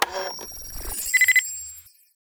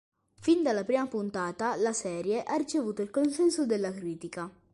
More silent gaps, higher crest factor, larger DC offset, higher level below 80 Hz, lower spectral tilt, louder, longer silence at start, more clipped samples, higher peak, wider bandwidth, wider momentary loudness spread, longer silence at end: neither; first, 22 dB vs 16 dB; neither; first, -44 dBFS vs -70 dBFS; second, 0.5 dB/octave vs -4.5 dB/octave; first, -20 LUFS vs -30 LUFS; second, 0 s vs 0.4 s; neither; first, -4 dBFS vs -14 dBFS; first, over 20 kHz vs 11.5 kHz; first, 18 LU vs 10 LU; first, 0.5 s vs 0.25 s